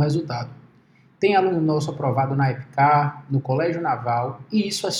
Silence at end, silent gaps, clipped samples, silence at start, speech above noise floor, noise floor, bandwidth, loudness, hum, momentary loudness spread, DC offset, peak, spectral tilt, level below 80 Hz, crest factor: 0 s; none; under 0.1%; 0 s; 34 dB; -55 dBFS; 12.5 kHz; -22 LUFS; none; 7 LU; under 0.1%; -6 dBFS; -6 dB/octave; -64 dBFS; 16 dB